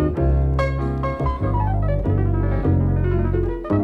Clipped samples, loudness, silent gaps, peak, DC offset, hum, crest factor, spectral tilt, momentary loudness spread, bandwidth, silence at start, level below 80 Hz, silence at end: under 0.1%; -21 LUFS; none; -8 dBFS; under 0.1%; none; 12 dB; -10 dB/octave; 4 LU; 5.8 kHz; 0 s; -24 dBFS; 0 s